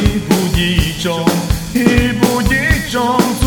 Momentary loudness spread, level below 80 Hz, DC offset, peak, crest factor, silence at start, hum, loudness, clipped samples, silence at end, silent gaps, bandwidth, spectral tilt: 3 LU; -24 dBFS; under 0.1%; 0 dBFS; 14 dB; 0 s; none; -14 LUFS; under 0.1%; 0 s; none; over 20 kHz; -5 dB/octave